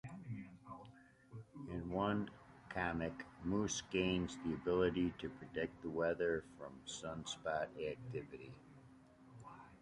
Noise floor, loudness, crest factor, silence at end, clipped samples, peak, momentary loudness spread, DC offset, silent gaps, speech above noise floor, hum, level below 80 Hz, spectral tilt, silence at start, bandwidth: -63 dBFS; -42 LUFS; 20 dB; 0 s; under 0.1%; -22 dBFS; 20 LU; under 0.1%; none; 22 dB; none; -62 dBFS; -5 dB/octave; 0.05 s; 11.5 kHz